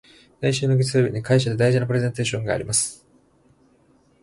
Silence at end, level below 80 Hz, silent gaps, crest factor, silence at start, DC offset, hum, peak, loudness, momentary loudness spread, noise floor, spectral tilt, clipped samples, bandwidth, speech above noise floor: 1.3 s; -52 dBFS; none; 16 dB; 0.4 s; under 0.1%; none; -6 dBFS; -21 LUFS; 6 LU; -59 dBFS; -5 dB/octave; under 0.1%; 11.5 kHz; 38 dB